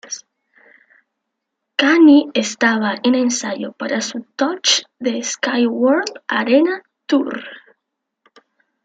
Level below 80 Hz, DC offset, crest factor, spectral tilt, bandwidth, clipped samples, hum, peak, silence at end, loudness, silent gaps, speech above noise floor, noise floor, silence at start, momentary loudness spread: -70 dBFS; under 0.1%; 16 dB; -2.5 dB/octave; 9.2 kHz; under 0.1%; none; -2 dBFS; 1.25 s; -17 LUFS; none; 61 dB; -78 dBFS; 0.05 s; 14 LU